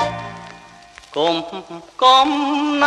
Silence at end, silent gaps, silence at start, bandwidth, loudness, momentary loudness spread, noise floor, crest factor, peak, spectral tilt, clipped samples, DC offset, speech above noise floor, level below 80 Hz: 0 s; none; 0 s; 10.5 kHz; -16 LUFS; 23 LU; -43 dBFS; 18 dB; -2 dBFS; -3.5 dB/octave; under 0.1%; under 0.1%; 26 dB; -54 dBFS